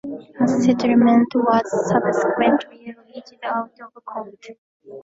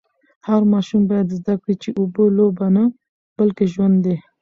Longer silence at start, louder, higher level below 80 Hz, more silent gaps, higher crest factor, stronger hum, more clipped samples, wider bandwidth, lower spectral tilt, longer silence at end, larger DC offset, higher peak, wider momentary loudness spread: second, 0.05 s vs 0.45 s; about the same, -18 LUFS vs -18 LUFS; about the same, -60 dBFS vs -58 dBFS; about the same, 4.58-4.80 s vs 3.09-3.36 s; about the same, 16 dB vs 14 dB; neither; neither; first, 7.8 kHz vs 7 kHz; second, -6.5 dB/octave vs -9.5 dB/octave; second, 0.05 s vs 0.2 s; neither; about the same, -4 dBFS vs -4 dBFS; first, 22 LU vs 6 LU